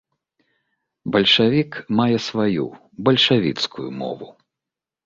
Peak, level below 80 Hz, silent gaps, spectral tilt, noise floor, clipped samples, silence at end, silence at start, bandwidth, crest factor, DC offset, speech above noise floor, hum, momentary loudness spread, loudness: -2 dBFS; -58 dBFS; none; -5.5 dB/octave; -87 dBFS; under 0.1%; 0.75 s; 1.05 s; 7.6 kHz; 18 dB; under 0.1%; 67 dB; none; 15 LU; -19 LUFS